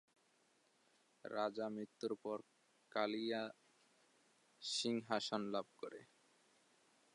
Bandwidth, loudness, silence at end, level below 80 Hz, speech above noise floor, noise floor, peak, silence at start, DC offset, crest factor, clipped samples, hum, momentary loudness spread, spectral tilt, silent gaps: 11 kHz; -44 LUFS; 1.1 s; under -90 dBFS; 34 dB; -77 dBFS; -24 dBFS; 1.25 s; under 0.1%; 22 dB; under 0.1%; none; 12 LU; -3.5 dB/octave; none